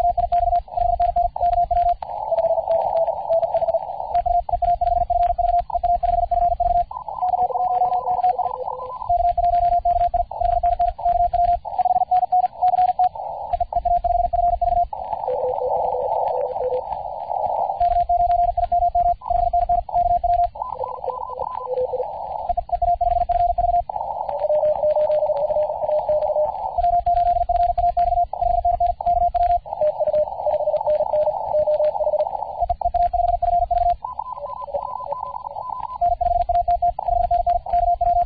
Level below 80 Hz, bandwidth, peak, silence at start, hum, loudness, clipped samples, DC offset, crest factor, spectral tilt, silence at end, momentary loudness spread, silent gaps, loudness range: -36 dBFS; 4.9 kHz; -10 dBFS; 0 s; none; -21 LUFS; under 0.1%; 0.2%; 10 dB; -10.5 dB/octave; 0 s; 8 LU; none; 3 LU